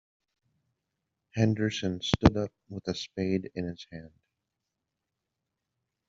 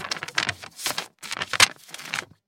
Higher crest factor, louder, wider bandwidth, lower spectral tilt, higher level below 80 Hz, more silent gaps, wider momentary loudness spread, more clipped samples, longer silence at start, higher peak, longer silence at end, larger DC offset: about the same, 30 dB vs 28 dB; second, -30 LUFS vs -24 LUFS; second, 7.6 kHz vs 17 kHz; first, -5.5 dB/octave vs 0 dB/octave; first, -50 dBFS vs -62 dBFS; neither; first, 16 LU vs 13 LU; neither; first, 1.35 s vs 0 s; second, -4 dBFS vs 0 dBFS; first, 2 s vs 0.25 s; neither